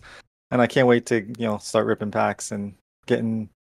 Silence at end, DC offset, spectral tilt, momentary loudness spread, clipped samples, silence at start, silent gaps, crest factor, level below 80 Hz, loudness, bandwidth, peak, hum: 0.2 s; under 0.1%; -5.5 dB/octave; 11 LU; under 0.1%; 0.05 s; 0.27-0.50 s, 2.81-3.03 s; 20 dB; -62 dBFS; -23 LUFS; 13.5 kHz; -4 dBFS; none